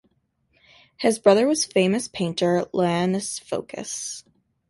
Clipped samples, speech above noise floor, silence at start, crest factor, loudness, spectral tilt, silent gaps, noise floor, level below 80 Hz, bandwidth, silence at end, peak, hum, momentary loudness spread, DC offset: under 0.1%; 46 dB; 1 s; 20 dB; -23 LUFS; -4.5 dB/octave; none; -68 dBFS; -64 dBFS; 12 kHz; 0.5 s; -4 dBFS; none; 13 LU; under 0.1%